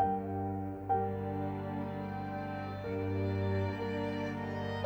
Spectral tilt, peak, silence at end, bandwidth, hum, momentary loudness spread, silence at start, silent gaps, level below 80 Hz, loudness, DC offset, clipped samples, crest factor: -8.5 dB/octave; -18 dBFS; 0 s; 16.5 kHz; 50 Hz at -60 dBFS; 6 LU; 0 s; none; -60 dBFS; -36 LUFS; under 0.1%; under 0.1%; 16 dB